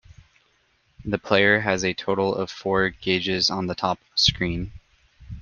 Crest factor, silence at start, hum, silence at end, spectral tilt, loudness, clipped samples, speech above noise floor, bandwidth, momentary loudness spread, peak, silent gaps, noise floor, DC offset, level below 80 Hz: 22 dB; 1 s; none; 0 s; -4 dB/octave; -22 LUFS; under 0.1%; 42 dB; 10 kHz; 11 LU; -2 dBFS; none; -65 dBFS; under 0.1%; -46 dBFS